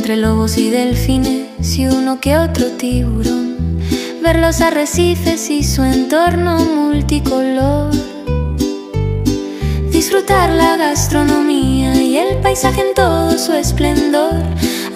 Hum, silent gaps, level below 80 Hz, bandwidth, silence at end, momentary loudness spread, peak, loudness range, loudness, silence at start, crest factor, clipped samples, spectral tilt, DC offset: none; none; -24 dBFS; 16 kHz; 0 s; 6 LU; 0 dBFS; 3 LU; -14 LUFS; 0 s; 14 dB; under 0.1%; -5 dB/octave; under 0.1%